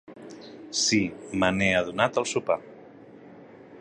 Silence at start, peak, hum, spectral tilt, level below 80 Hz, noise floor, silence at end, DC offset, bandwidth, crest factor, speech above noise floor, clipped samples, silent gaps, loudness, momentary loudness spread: 0.1 s; -4 dBFS; none; -3.5 dB/octave; -56 dBFS; -48 dBFS; 0 s; under 0.1%; 11.5 kHz; 24 dB; 23 dB; under 0.1%; none; -25 LUFS; 21 LU